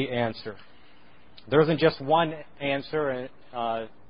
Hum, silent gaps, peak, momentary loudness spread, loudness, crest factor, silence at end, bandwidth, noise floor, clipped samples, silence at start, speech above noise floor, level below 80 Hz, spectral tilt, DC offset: none; none; -6 dBFS; 13 LU; -26 LUFS; 20 dB; 0.2 s; 5.4 kHz; -56 dBFS; under 0.1%; 0 s; 30 dB; -60 dBFS; -10.5 dB/octave; 0.5%